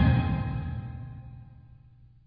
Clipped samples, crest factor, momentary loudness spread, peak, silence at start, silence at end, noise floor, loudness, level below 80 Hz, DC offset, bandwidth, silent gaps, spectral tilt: under 0.1%; 18 dB; 23 LU; -12 dBFS; 0 s; 0.5 s; -55 dBFS; -30 LUFS; -36 dBFS; under 0.1%; 5 kHz; none; -11.5 dB/octave